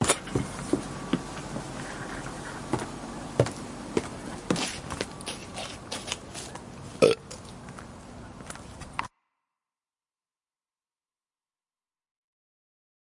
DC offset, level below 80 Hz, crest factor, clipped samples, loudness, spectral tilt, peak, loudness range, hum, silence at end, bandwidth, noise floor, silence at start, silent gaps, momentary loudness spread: under 0.1%; -52 dBFS; 30 dB; under 0.1%; -32 LUFS; -4 dB/octave; -4 dBFS; 13 LU; none; 4 s; 11.5 kHz; under -90 dBFS; 0 s; none; 16 LU